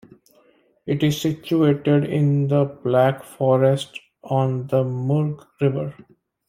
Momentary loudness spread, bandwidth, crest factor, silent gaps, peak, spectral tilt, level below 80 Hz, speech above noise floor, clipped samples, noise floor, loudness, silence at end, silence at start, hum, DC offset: 9 LU; 15.5 kHz; 16 dB; none; -4 dBFS; -7.5 dB/octave; -60 dBFS; 38 dB; under 0.1%; -58 dBFS; -21 LUFS; 0.55 s; 0.85 s; none; under 0.1%